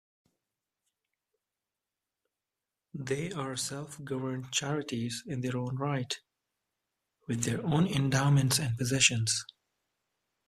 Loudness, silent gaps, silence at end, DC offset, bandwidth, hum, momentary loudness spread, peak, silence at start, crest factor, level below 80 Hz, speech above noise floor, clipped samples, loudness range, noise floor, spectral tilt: -30 LUFS; none; 1.05 s; under 0.1%; 14 kHz; none; 14 LU; -10 dBFS; 2.95 s; 24 dB; -64 dBFS; 59 dB; under 0.1%; 11 LU; -90 dBFS; -4 dB/octave